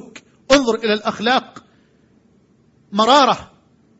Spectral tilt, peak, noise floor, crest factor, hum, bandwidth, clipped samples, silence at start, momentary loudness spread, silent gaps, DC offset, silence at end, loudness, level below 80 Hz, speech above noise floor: -3.5 dB/octave; 0 dBFS; -55 dBFS; 20 dB; none; 8.8 kHz; under 0.1%; 0.15 s; 8 LU; none; under 0.1%; 0.55 s; -16 LUFS; -52 dBFS; 39 dB